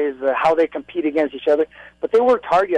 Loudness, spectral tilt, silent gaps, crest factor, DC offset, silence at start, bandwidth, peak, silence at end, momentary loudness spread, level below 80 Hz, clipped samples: -19 LUFS; -5.5 dB/octave; none; 10 dB; under 0.1%; 0 s; 9.8 kHz; -8 dBFS; 0 s; 7 LU; -58 dBFS; under 0.1%